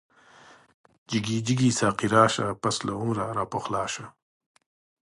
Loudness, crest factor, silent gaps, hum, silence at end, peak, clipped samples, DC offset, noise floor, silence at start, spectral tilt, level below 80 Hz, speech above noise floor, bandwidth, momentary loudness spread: -26 LUFS; 24 dB; none; none; 1 s; -4 dBFS; under 0.1%; under 0.1%; -54 dBFS; 1.1 s; -5 dB/octave; -58 dBFS; 28 dB; 11.5 kHz; 10 LU